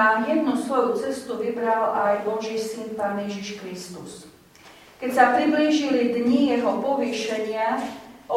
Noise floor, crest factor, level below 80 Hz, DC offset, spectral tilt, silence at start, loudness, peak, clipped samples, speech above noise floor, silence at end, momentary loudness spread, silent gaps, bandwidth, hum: -49 dBFS; 20 dB; -66 dBFS; under 0.1%; -4.5 dB/octave; 0 s; -23 LUFS; -4 dBFS; under 0.1%; 26 dB; 0 s; 15 LU; none; 16 kHz; none